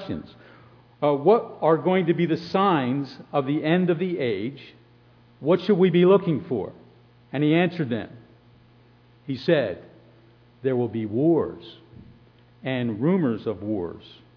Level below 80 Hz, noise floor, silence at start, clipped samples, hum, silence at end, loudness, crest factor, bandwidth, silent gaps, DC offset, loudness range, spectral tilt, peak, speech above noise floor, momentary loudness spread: -64 dBFS; -55 dBFS; 0 s; under 0.1%; 60 Hz at -55 dBFS; 0.3 s; -23 LUFS; 18 dB; 5.4 kHz; none; under 0.1%; 5 LU; -9 dB/octave; -6 dBFS; 32 dB; 15 LU